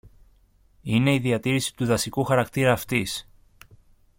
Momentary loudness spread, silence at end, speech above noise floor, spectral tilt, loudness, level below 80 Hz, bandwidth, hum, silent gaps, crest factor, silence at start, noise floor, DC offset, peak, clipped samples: 7 LU; 0.95 s; 36 dB; -5 dB/octave; -24 LUFS; -52 dBFS; 17 kHz; none; none; 18 dB; 0.85 s; -59 dBFS; under 0.1%; -6 dBFS; under 0.1%